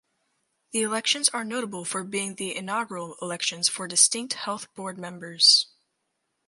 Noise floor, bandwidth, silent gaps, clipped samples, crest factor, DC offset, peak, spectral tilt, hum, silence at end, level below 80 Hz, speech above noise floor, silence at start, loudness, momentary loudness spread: -78 dBFS; 12 kHz; none; under 0.1%; 24 dB; under 0.1%; -2 dBFS; -1 dB/octave; none; 0.85 s; -80 dBFS; 51 dB; 0.75 s; -23 LUFS; 17 LU